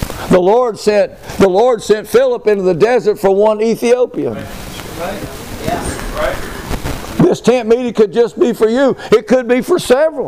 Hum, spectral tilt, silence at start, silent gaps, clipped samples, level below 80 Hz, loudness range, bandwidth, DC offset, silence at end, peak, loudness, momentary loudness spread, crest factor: none; -5.5 dB/octave; 0 s; none; under 0.1%; -34 dBFS; 6 LU; 16 kHz; 0.4%; 0 s; 0 dBFS; -13 LUFS; 12 LU; 12 dB